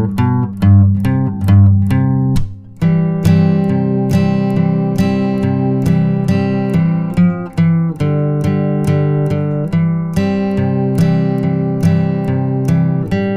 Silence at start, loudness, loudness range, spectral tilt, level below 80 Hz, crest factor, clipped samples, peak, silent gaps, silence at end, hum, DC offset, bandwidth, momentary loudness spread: 0 s; -14 LUFS; 2 LU; -9 dB/octave; -36 dBFS; 12 dB; under 0.1%; 0 dBFS; none; 0 s; none; under 0.1%; 12 kHz; 5 LU